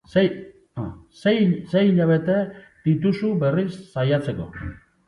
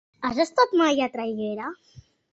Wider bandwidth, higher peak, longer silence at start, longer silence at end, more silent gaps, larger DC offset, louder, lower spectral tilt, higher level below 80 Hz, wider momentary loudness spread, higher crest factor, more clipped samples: first, 10.5 kHz vs 8.2 kHz; about the same, -4 dBFS vs -6 dBFS; about the same, 0.15 s vs 0.2 s; about the same, 0.35 s vs 0.3 s; neither; neither; about the same, -22 LUFS vs -24 LUFS; first, -8.5 dB/octave vs -4 dB/octave; first, -50 dBFS vs -62 dBFS; first, 15 LU vs 12 LU; about the same, 18 dB vs 18 dB; neither